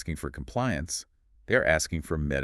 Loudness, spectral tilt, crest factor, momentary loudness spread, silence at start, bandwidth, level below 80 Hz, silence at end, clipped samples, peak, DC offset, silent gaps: -28 LUFS; -4.5 dB/octave; 22 dB; 12 LU; 0 s; 13.5 kHz; -42 dBFS; 0 s; under 0.1%; -8 dBFS; under 0.1%; none